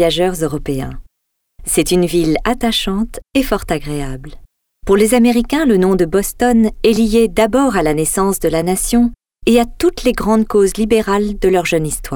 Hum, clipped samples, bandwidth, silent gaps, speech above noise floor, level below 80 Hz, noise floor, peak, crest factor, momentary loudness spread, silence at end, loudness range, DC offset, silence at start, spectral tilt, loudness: none; under 0.1%; 20 kHz; none; 58 dB; -30 dBFS; -72 dBFS; 0 dBFS; 14 dB; 8 LU; 0 s; 4 LU; under 0.1%; 0 s; -4.5 dB/octave; -15 LUFS